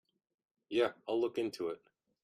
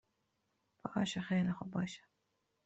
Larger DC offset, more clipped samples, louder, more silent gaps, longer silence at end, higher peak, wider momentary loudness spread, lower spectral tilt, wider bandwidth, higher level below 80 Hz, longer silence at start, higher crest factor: neither; neither; about the same, -36 LUFS vs -38 LUFS; neither; second, 0.45 s vs 0.65 s; about the same, -18 dBFS vs -20 dBFS; second, 8 LU vs 11 LU; about the same, -5 dB/octave vs -6 dB/octave; first, 13 kHz vs 8.2 kHz; second, -82 dBFS vs -74 dBFS; second, 0.7 s vs 0.85 s; about the same, 20 dB vs 20 dB